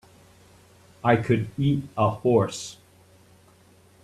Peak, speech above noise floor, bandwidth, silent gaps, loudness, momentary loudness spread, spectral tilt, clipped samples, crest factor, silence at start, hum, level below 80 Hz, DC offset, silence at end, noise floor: -6 dBFS; 33 dB; 13 kHz; none; -24 LUFS; 9 LU; -6.5 dB/octave; under 0.1%; 20 dB; 1.05 s; none; -58 dBFS; under 0.1%; 1.3 s; -56 dBFS